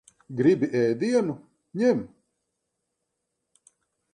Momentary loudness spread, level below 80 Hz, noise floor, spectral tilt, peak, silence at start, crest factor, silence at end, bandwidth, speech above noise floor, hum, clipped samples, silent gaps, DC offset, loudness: 17 LU; -68 dBFS; -80 dBFS; -7 dB/octave; -8 dBFS; 0.3 s; 20 dB; 2.05 s; 9.8 kHz; 57 dB; none; under 0.1%; none; under 0.1%; -24 LUFS